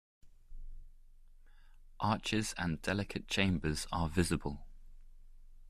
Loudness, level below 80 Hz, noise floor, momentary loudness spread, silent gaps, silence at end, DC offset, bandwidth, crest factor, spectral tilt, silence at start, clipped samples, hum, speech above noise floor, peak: -35 LUFS; -50 dBFS; -57 dBFS; 12 LU; none; 0 s; under 0.1%; 14 kHz; 20 dB; -4.5 dB/octave; 0.25 s; under 0.1%; none; 22 dB; -18 dBFS